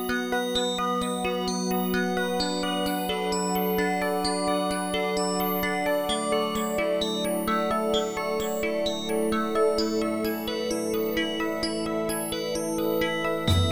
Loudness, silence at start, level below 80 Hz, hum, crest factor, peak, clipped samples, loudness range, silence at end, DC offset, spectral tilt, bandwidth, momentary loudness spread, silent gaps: -26 LUFS; 0 s; -50 dBFS; none; 16 dB; -10 dBFS; under 0.1%; 1 LU; 0 s; under 0.1%; -4.5 dB/octave; over 20 kHz; 3 LU; none